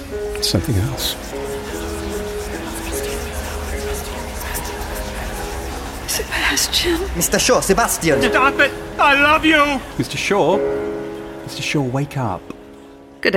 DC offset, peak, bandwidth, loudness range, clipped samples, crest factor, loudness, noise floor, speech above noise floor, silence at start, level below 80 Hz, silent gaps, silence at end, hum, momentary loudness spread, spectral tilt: under 0.1%; -2 dBFS; 16.5 kHz; 11 LU; under 0.1%; 18 dB; -19 LUFS; -40 dBFS; 23 dB; 0 s; -32 dBFS; none; 0 s; none; 13 LU; -3.5 dB/octave